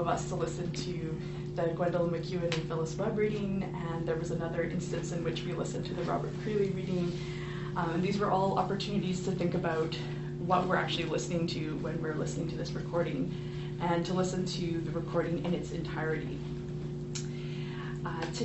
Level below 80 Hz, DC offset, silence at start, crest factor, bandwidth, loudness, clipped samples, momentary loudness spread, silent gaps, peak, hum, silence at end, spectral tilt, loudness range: -52 dBFS; under 0.1%; 0 s; 20 dB; 8.2 kHz; -33 LUFS; under 0.1%; 7 LU; none; -14 dBFS; none; 0 s; -6 dB/octave; 3 LU